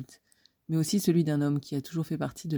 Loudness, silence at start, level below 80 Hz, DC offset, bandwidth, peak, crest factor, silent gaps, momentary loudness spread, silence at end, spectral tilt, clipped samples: -29 LUFS; 0 s; -68 dBFS; under 0.1%; over 20 kHz; -14 dBFS; 16 dB; none; 8 LU; 0 s; -6.5 dB/octave; under 0.1%